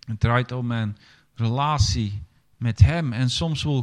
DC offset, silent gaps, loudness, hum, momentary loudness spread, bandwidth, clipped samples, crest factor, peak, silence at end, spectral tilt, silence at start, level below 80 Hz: under 0.1%; none; -23 LUFS; none; 11 LU; 10 kHz; under 0.1%; 22 dB; -2 dBFS; 0 s; -5.5 dB/octave; 0.05 s; -38 dBFS